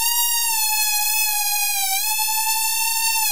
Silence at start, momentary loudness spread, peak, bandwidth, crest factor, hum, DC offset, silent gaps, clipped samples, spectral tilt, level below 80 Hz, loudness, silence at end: 0 s; 2 LU; -6 dBFS; 16 kHz; 16 dB; none; 3%; none; under 0.1%; 4.5 dB/octave; -68 dBFS; -18 LUFS; 0 s